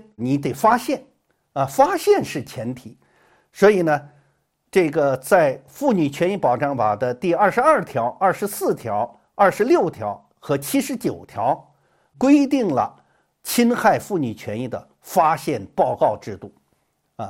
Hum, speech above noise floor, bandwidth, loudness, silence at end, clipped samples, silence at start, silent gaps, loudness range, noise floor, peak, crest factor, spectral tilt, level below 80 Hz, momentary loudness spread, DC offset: none; 48 dB; 16.5 kHz; -20 LUFS; 0 s; under 0.1%; 0.2 s; none; 3 LU; -68 dBFS; -2 dBFS; 18 dB; -5.5 dB/octave; -60 dBFS; 13 LU; under 0.1%